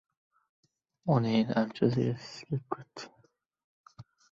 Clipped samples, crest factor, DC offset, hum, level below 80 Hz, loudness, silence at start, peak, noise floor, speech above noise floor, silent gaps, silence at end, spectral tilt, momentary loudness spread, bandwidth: under 0.1%; 20 dB; under 0.1%; none; -68 dBFS; -31 LUFS; 1.05 s; -12 dBFS; -69 dBFS; 39 dB; 3.64-3.84 s; 0.3 s; -7.5 dB/octave; 18 LU; 7.6 kHz